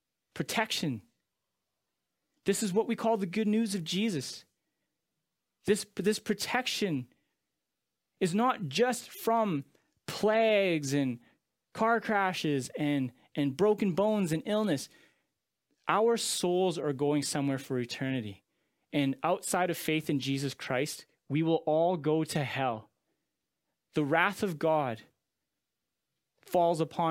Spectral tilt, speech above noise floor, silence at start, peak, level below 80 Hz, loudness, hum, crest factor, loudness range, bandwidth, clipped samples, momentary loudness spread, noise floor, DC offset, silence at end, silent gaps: -5 dB/octave; 57 dB; 0.35 s; -10 dBFS; -72 dBFS; -30 LUFS; none; 22 dB; 4 LU; 16.5 kHz; under 0.1%; 10 LU; -87 dBFS; under 0.1%; 0 s; none